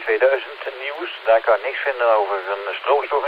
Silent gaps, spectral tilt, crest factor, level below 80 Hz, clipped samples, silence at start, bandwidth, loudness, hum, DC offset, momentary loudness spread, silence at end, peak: none; -3 dB/octave; 18 dB; -68 dBFS; under 0.1%; 0 s; 5.2 kHz; -20 LUFS; none; under 0.1%; 10 LU; 0 s; -2 dBFS